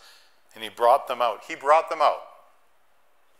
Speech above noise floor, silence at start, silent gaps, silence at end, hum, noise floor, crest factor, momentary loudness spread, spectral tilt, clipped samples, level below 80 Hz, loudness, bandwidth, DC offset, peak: 44 dB; 0.55 s; none; 1.15 s; none; -66 dBFS; 20 dB; 15 LU; -2 dB/octave; under 0.1%; -78 dBFS; -23 LUFS; 16 kHz; 0.1%; -6 dBFS